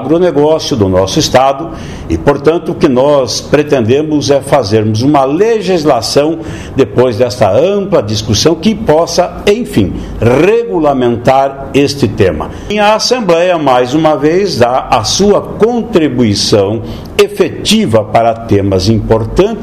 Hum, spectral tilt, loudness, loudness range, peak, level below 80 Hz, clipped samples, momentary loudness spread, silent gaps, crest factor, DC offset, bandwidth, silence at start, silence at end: none; -5 dB/octave; -10 LUFS; 1 LU; 0 dBFS; -32 dBFS; 0.8%; 4 LU; none; 10 dB; 0.4%; 15.5 kHz; 0 s; 0 s